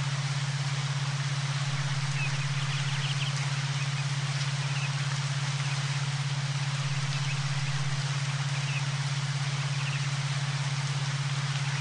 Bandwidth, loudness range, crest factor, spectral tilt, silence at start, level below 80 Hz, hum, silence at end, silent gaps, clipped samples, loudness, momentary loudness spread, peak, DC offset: 10.5 kHz; 0 LU; 12 dB; -4 dB/octave; 0 s; -62 dBFS; none; 0 s; none; under 0.1%; -30 LUFS; 1 LU; -18 dBFS; under 0.1%